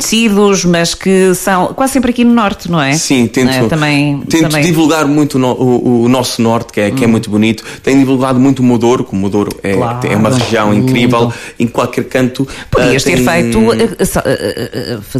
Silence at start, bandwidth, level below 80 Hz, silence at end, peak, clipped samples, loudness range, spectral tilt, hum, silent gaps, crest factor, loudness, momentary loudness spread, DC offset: 0 s; 16 kHz; -36 dBFS; 0 s; 0 dBFS; under 0.1%; 2 LU; -5 dB/octave; none; none; 10 dB; -11 LUFS; 5 LU; under 0.1%